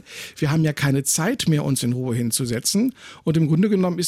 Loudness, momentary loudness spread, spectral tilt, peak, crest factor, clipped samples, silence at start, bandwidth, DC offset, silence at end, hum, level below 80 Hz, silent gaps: -21 LUFS; 6 LU; -5 dB/octave; -8 dBFS; 12 dB; under 0.1%; 0.1 s; 16 kHz; under 0.1%; 0 s; none; -54 dBFS; none